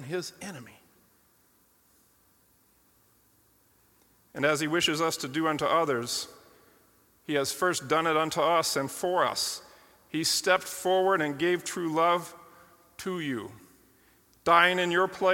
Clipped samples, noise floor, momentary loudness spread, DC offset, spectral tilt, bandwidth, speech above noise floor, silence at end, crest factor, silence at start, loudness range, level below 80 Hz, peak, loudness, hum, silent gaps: under 0.1%; -65 dBFS; 15 LU; under 0.1%; -3 dB/octave; 17.5 kHz; 38 dB; 0 s; 24 dB; 0 s; 5 LU; -70 dBFS; -6 dBFS; -27 LUFS; none; none